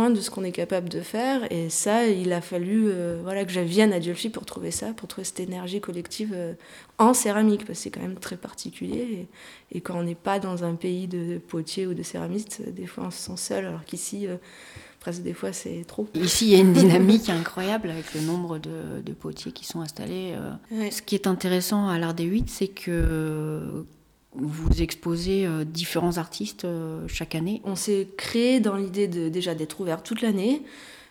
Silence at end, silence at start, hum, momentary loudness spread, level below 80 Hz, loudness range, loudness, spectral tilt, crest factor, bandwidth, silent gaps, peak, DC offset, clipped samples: 0.05 s; 0 s; none; 14 LU; -42 dBFS; 11 LU; -26 LUFS; -5 dB/octave; 22 dB; 19 kHz; none; -4 dBFS; under 0.1%; under 0.1%